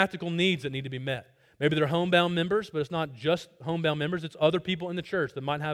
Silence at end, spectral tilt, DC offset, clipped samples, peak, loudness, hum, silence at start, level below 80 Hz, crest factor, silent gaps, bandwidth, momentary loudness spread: 0 s; -6 dB/octave; under 0.1%; under 0.1%; -8 dBFS; -28 LUFS; none; 0 s; -64 dBFS; 20 dB; none; 13 kHz; 10 LU